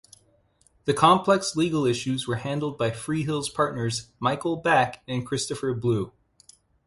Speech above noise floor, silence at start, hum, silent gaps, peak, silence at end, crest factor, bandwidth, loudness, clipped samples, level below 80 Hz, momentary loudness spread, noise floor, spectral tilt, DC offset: 39 dB; 0.85 s; none; none; -6 dBFS; 0.75 s; 20 dB; 11.5 kHz; -25 LUFS; under 0.1%; -58 dBFS; 9 LU; -64 dBFS; -5 dB/octave; under 0.1%